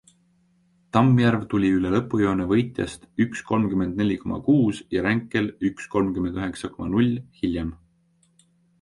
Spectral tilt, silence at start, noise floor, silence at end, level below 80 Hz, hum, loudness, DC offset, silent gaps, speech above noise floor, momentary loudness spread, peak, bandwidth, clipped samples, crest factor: -7.5 dB/octave; 0.95 s; -64 dBFS; 1.05 s; -48 dBFS; none; -23 LUFS; under 0.1%; none; 41 dB; 9 LU; -4 dBFS; 11.5 kHz; under 0.1%; 20 dB